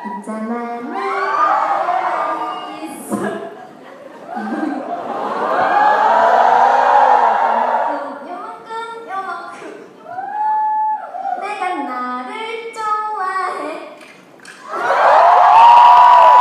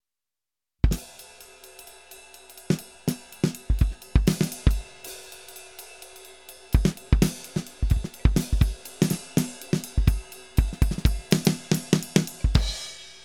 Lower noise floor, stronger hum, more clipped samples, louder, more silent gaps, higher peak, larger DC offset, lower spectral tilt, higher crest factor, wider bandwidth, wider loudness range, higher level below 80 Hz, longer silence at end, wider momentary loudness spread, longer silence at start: second, -40 dBFS vs -90 dBFS; neither; neither; first, -14 LUFS vs -26 LUFS; neither; about the same, 0 dBFS vs -2 dBFS; second, under 0.1% vs 0.2%; second, -4 dB/octave vs -5.5 dB/octave; second, 14 dB vs 24 dB; second, 12.5 kHz vs 18 kHz; first, 10 LU vs 6 LU; second, -66 dBFS vs -30 dBFS; about the same, 0 s vs 0.1 s; about the same, 21 LU vs 21 LU; second, 0 s vs 0.85 s